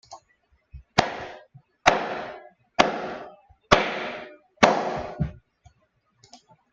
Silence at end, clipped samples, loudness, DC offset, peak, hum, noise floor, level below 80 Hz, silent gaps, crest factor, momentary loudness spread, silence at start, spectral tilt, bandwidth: 0.35 s; under 0.1%; -24 LUFS; under 0.1%; 0 dBFS; none; -68 dBFS; -50 dBFS; none; 26 dB; 19 LU; 0.1 s; -4 dB/octave; 9.6 kHz